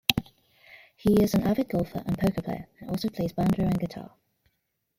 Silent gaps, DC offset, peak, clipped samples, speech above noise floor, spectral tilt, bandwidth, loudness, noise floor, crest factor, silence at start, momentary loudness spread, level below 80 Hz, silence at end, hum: none; under 0.1%; 0 dBFS; under 0.1%; 51 dB; -6 dB/octave; 16.5 kHz; -27 LUFS; -77 dBFS; 28 dB; 0.1 s; 13 LU; -48 dBFS; 0.95 s; none